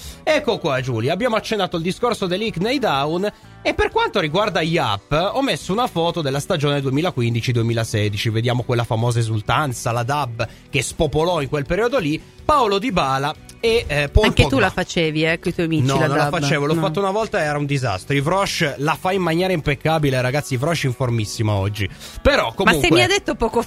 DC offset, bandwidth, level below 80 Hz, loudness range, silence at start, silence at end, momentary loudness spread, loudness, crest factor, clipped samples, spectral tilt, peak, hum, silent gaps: under 0.1%; 15.5 kHz; -36 dBFS; 3 LU; 0 s; 0 s; 5 LU; -19 LUFS; 20 dB; under 0.1%; -5 dB/octave; 0 dBFS; none; none